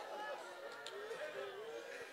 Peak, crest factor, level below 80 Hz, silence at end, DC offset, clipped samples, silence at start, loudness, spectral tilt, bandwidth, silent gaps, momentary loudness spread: -28 dBFS; 20 dB; under -90 dBFS; 0 s; under 0.1%; under 0.1%; 0 s; -48 LUFS; -2 dB/octave; 16 kHz; none; 3 LU